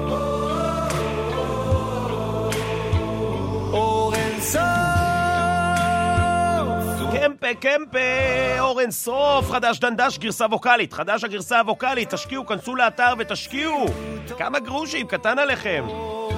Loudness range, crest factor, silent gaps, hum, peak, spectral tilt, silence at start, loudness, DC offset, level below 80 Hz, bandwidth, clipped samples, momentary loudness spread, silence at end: 3 LU; 18 dB; none; none; -4 dBFS; -4.5 dB/octave; 0 s; -22 LUFS; under 0.1%; -40 dBFS; 16 kHz; under 0.1%; 6 LU; 0 s